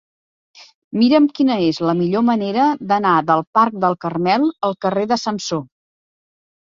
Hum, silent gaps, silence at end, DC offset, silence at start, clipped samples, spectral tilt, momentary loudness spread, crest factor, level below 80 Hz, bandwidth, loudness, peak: none; 0.75-0.91 s, 3.47-3.53 s; 1.1 s; under 0.1%; 0.6 s; under 0.1%; -6 dB/octave; 7 LU; 16 dB; -62 dBFS; 7.6 kHz; -17 LUFS; -2 dBFS